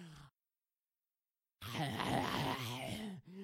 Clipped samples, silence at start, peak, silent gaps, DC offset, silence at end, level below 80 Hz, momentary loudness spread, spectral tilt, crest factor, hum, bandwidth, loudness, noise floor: under 0.1%; 0 s; -24 dBFS; none; under 0.1%; 0 s; -68 dBFS; 16 LU; -4.5 dB/octave; 20 dB; none; 16.5 kHz; -40 LUFS; under -90 dBFS